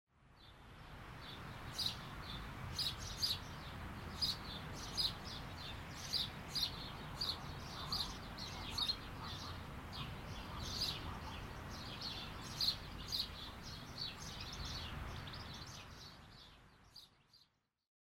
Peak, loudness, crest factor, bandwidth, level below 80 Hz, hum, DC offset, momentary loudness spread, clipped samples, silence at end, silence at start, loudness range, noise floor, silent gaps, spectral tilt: -22 dBFS; -43 LUFS; 22 dB; 16 kHz; -56 dBFS; none; under 0.1%; 16 LU; under 0.1%; 0.65 s; 0.15 s; 7 LU; -75 dBFS; none; -3 dB/octave